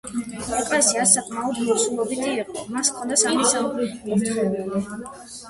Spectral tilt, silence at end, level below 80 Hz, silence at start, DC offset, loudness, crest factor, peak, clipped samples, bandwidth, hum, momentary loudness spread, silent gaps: -2.5 dB/octave; 0 s; -56 dBFS; 0.05 s; under 0.1%; -21 LUFS; 22 dB; 0 dBFS; under 0.1%; 12 kHz; none; 12 LU; none